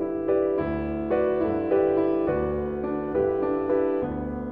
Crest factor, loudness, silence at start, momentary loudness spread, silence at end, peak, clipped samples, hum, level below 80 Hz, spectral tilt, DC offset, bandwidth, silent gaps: 14 dB; -25 LUFS; 0 s; 6 LU; 0 s; -12 dBFS; under 0.1%; none; -44 dBFS; -11 dB/octave; 0.2%; 4.3 kHz; none